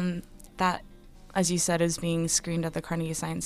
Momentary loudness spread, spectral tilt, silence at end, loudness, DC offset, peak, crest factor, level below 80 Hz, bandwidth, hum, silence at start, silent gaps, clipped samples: 8 LU; -4 dB/octave; 0 s; -28 LUFS; under 0.1%; -12 dBFS; 18 dB; -50 dBFS; 15.5 kHz; none; 0 s; none; under 0.1%